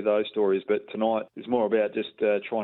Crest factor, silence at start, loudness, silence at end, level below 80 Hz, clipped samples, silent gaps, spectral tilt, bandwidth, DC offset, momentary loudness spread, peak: 14 dB; 0 s; -26 LUFS; 0 s; -72 dBFS; under 0.1%; none; -9.5 dB/octave; 4.2 kHz; under 0.1%; 4 LU; -12 dBFS